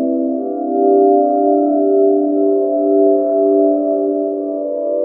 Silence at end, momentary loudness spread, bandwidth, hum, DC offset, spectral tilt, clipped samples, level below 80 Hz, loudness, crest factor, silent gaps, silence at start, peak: 0 s; 7 LU; 1.5 kHz; none; under 0.1%; -13.5 dB/octave; under 0.1%; -72 dBFS; -14 LUFS; 12 dB; none; 0 s; -2 dBFS